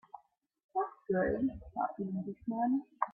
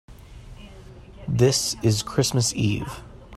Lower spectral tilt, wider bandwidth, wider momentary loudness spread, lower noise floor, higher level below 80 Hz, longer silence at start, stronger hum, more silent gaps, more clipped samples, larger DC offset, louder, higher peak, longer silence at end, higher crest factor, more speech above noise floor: first, -12 dB/octave vs -4.5 dB/octave; second, 3.3 kHz vs 14.5 kHz; second, 7 LU vs 20 LU; first, -65 dBFS vs -43 dBFS; second, -60 dBFS vs -46 dBFS; about the same, 0.15 s vs 0.1 s; neither; first, 0.64-0.69 s vs none; neither; neither; second, -36 LUFS vs -22 LUFS; second, -16 dBFS vs -4 dBFS; about the same, 0 s vs 0 s; about the same, 20 dB vs 20 dB; first, 30 dB vs 21 dB